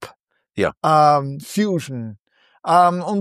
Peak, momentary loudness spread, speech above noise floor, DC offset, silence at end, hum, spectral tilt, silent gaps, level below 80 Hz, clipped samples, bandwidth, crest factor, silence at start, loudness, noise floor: -2 dBFS; 17 LU; 35 dB; under 0.1%; 0 s; none; -6 dB/octave; 0.77-0.81 s, 2.20-2.25 s; -60 dBFS; under 0.1%; 14.5 kHz; 16 dB; 0 s; -18 LUFS; -52 dBFS